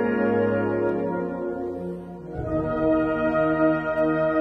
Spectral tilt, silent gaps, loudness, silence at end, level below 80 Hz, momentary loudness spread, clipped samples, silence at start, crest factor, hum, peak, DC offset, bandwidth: -9.5 dB/octave; none; -24 LUFS; 0 s; -48 dBFS; 11 LU; under 0.1%; 0 s; 14 dB; none; -10 dBFS; under 0.1%; 5.2 kHz